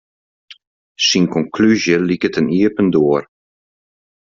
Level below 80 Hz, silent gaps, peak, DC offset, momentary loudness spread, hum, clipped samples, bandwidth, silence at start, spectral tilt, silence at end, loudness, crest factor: -54 dBFS; 0.67-0.95 s; -2 dBFS; under 0.1%; 4 LU; none; under 0.1%; 7.6 kHz; 0.5 s; -5 dB/octave; 1.05 s; -15 LUFS; 14 dB